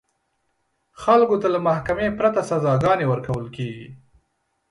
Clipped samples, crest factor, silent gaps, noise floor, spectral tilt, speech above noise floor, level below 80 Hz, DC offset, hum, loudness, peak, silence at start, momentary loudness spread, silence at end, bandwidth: under 0.1%; 18 dB; none; -72 dBFS; -7.5 dB/octave; 52 dB; -50 dBFS; under 0.1%; none; -21 LUFS; -4 dBFS; 1 s; 14 LU; 0.75 s; 11.5 kHz